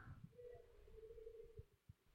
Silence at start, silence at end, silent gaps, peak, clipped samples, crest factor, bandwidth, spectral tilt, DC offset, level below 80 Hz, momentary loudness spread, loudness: 0 s; 0 s; none; -46 dBFS; under 0.1%; 14 dB; 16 kHz; -7.5 dB/octave; under 0.1%; -68 dBFS; 6 LU; -62 LUFS